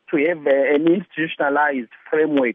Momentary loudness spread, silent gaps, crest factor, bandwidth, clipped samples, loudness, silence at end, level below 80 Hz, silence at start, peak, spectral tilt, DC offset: 7 LU; none; 12 dB; 3.8 kHz; under 0.1%; -19 LUFS; 0 s; -74 dBFS; 0.1 s; -6 dBFS; -9 dB/octave; under 0.1%